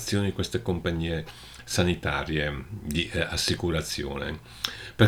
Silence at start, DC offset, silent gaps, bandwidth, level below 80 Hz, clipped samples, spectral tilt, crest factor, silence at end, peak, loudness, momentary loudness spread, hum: 0 s; under 0.1%; none; 20 kHz; -42 dBFS; under 0.1%; -4.5 dB/octave; 22 dB; 0 s; -4 dBFS; -29 LUFS; 8 LU; none